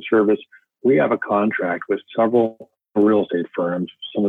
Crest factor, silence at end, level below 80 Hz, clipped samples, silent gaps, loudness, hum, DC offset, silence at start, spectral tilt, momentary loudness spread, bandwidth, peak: 14 dB; 0 s; -66 dBFS; under 0.1%; none; -20 LUFS; none; under 0.1%; 0 s; -9 dB/octave; 7 LU; 3.9 kHz; -6 dBFS